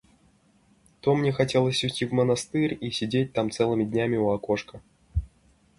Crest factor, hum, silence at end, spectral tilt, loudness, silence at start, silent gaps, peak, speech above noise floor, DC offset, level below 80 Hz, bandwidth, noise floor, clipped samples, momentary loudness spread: 18 dB; none; 0.55 s; -5.5 dB/octave; -26 LUFS; 1.05 s; none; -8 dBFS; 37 dB; under 0.1%; -44 dBFS; 11.5 kHz; -62 dBFS; under 0.1%; 9 LU